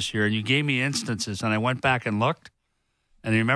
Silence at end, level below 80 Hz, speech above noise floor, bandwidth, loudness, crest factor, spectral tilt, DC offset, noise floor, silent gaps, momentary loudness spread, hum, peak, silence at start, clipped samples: 0 s; -58 dBFS; 49 dB; 11 kHz; -24 LUFS; 18 dB; -4.5 dB/octave; under 0.1%; -74 dBFS; none; 6 LU; none; -8 dBFS; 0 s; under 0.1%